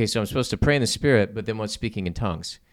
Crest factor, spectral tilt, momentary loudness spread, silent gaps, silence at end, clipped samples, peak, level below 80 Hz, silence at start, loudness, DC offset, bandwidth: 20 dB; -5 dB/octave; 9 LU; none; 0.2 s; under 0.1%; -4 dBFS; -40 dBFS; 0 s; -24 LUFS; under 0.1%; 16 kHz